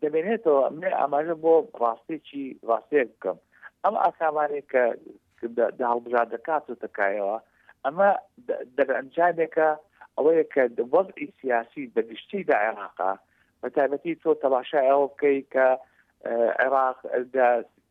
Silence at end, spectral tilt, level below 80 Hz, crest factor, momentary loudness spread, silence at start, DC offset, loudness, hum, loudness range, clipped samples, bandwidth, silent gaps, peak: 0.25 s; -8 dB/octave; -78 dBFS; 16 dB; 11 LU; 0 s; under 0.1%; -25 LUFS; none; 3 LU; under 0.1%; 4.1 kHz; none; -8 dBFS